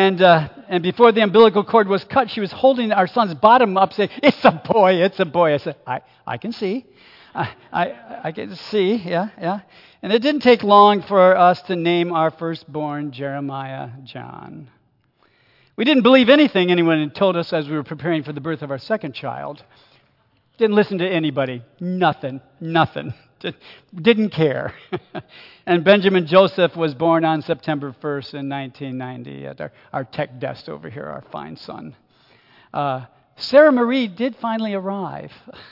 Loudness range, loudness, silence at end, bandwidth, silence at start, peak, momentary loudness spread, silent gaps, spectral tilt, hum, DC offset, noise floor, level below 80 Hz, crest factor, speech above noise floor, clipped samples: 13 LU; -18 LUFS; 0.1 s; 5.8 kHz; 0 s; 0 dBFS; 20 LU; none; -8 dB/octave; none; under 0.1%; -61 dBFS; -64 dBFS; 18 dB; 43 dB; under 0.1%